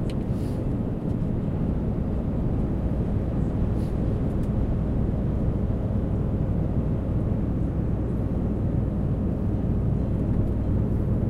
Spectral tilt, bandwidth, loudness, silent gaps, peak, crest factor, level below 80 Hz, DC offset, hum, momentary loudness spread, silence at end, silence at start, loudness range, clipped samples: -10.5 dB/octave; 5 kHz; -26 LUFS; none; -12 dBFS; 12 dB; -30 dBFS; under 0.1%; none; 2 LU; 0 s; 0 s; 1 LU; under 0.1%